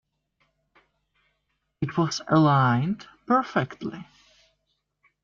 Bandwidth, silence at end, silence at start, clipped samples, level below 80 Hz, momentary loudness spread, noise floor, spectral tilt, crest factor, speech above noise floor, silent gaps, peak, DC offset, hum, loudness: 7.4 kHz; 1.2 s; 1.8 s; under 0.1%; -64 dBFS; 16 LU; -76 dBFS; -6.5 dB/octave; 18 dB; 53 dB; none; -8 dBFS; under 0.1%; none; -24 LUFS